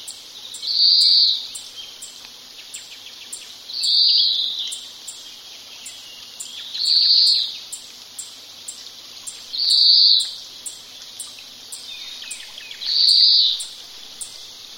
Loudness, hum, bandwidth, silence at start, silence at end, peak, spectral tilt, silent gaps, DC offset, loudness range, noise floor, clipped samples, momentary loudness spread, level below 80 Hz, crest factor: -14 LUFS; none; 16.5 kHz; 0 s; 0 s; -2 dBFS; 3 dB/octave; none; under 0.1%; 3 LU; -40 dBFS; under 0.1%; 24 LU; -70 dBFS; 20 dB